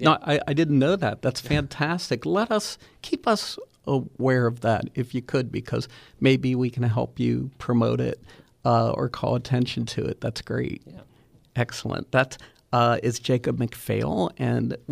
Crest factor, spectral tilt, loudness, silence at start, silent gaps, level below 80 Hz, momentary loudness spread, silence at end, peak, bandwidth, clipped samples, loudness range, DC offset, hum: 20 dB; -6 dB/octave; -25 LUFS; 0 s; none; -52 dBFS; 9 LU; 0 s; -4 dBFS; 15 kHz; under 0.1%; 3 LU; under 0.1%; none